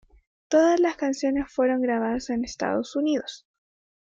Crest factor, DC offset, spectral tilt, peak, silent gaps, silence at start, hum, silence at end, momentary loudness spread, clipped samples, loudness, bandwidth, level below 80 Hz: 18 dB; under 0.1%; -4.5 dB/octave; -8 dBFS; none; 0.5 s; none; 0.8 s; 9 LU; under 0.1%; -24 LUFS; 7.8 kHz; -56 dBFS